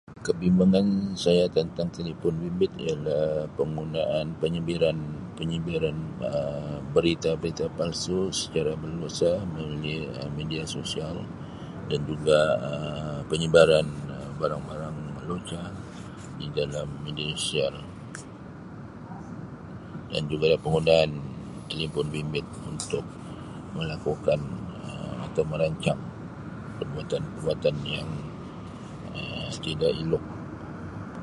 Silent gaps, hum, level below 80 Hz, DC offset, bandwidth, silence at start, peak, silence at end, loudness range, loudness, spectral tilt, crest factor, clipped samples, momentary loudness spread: none; none; -50 dBFS; under 0.1%; 11.5 kHz; 0.1 s; -4 dBFS; 0 s; 7 LU; -28 LUFS; -5.5 dB/octave; 24 dB; under 0.1%; 17 LU